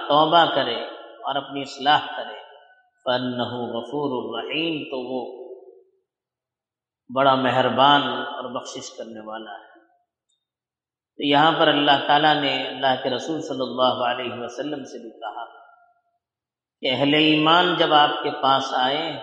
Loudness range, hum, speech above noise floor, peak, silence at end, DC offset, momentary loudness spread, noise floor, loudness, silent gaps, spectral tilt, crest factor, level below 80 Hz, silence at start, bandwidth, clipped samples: 9 LU; none; over 69 dB; -4 dBFS; 0 s; under 0.1%; 19 LU; under -90 dBFS; -21 LUFS; none; -4.5 dB/octave; 20 dB; -72 dBFS; 0 s; 8.8 kHz; under 0.1%